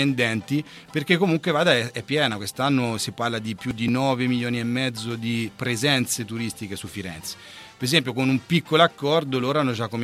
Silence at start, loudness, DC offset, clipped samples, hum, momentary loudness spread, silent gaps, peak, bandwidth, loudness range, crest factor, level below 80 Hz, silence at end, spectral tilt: 0 s; -23 LUFS; under 0.1%; under 0.1%; none; 12 LU; none; -2 dBFS; 15.5 kHz; 3 LU; 20 dB; -60 dBFS; 0 s; -4.5 dB/octave